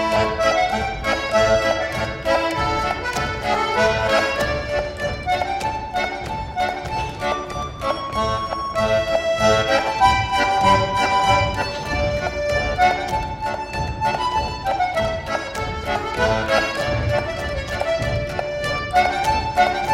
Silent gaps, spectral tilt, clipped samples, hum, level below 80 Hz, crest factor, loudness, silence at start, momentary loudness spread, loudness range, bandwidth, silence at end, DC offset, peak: none; -4.5 dB/octave; under 0.1%; none; -36 dBFS; 18 dB; -20 LUFS; 0 s; 8 LU; 5 LU; 16 kHz; 0 s; under 0.1%; -2 dBFS